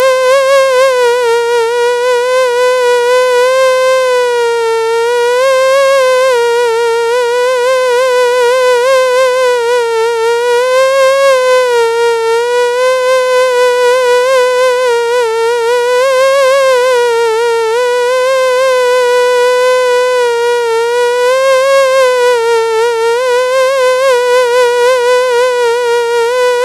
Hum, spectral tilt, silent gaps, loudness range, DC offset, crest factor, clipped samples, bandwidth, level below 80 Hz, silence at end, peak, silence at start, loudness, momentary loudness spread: none; 0 dB/octave; none; 0 LU; under 0.1%; 8 dB; under 0.1%; 14 kHz; -58 dBFS; 0 s; 0 dBFS; 0 s; -9 LUFS; 3 LU